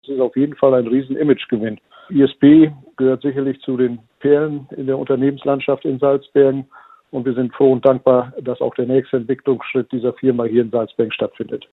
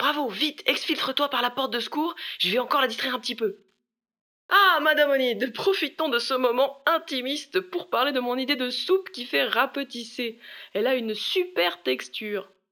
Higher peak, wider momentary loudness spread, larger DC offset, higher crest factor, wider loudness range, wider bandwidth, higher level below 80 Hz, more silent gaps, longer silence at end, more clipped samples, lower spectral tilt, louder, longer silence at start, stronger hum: first, 0 dBFS vs -6 dBFS; about the same, 10 LU vs 10 LU; neither; about the same, 16 dB vs 20 dB; about the same, 3 LU vs 4 LU; second, 4.1 kHz vs over 20 kHz; first, -60 dBFS vs -86 dBFS; second, none vs 4.21-4.49 s; about the same, 0.15 s vs 0.25 s; neither; first, -10.5 dB/octave vs -3 dB/octave; first, -17 LUFS vs -25 LUFS; about the same, 0.1 s vs 0 s; neither